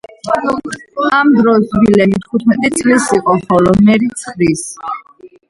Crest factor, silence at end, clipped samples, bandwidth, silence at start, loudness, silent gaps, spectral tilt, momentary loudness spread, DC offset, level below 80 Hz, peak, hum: 12 dB; 0.2 s; under 0.1%; 11.5 kHz; 0.25 s; -12 LUFS; none; -5.5 dB/octave; 12 LU; under 0.1%; -42 dBFS; 0 dBFS; none